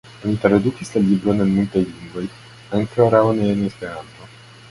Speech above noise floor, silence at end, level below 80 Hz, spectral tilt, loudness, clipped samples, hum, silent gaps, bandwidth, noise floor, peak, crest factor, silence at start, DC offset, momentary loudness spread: 24 dB; 0.45 s; -48 dBFS; -7.5 dB/octave; -19 LUFS; under 0.1%; none; none; 11.5 kHz; -42 dBFS; 0 dBFS; 18 dB; 0.15 s; under 0.1%; 15 LU